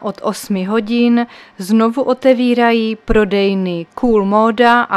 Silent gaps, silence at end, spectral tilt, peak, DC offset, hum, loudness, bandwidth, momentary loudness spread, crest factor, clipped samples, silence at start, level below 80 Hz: none; 0 s; -6 dB/octave; 0 dBFS; under 0.1%; none; -14 LUFS; 14 kHz; 9 LU; 14 dB; under 0.1%; 0 s; -34 dBFS